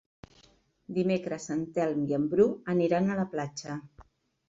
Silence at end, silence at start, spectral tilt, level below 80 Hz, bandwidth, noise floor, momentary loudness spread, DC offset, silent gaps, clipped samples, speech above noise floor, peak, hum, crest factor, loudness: 0.5 s; 0.9 s; -7 dB/octave; -64 dBFS; 7.8 kHz; -63 dBFS; 11 LU; under 0.1%; none; under 0.1%; 35 dB; -12 dBFS; none; 18 dB; -29 LUFS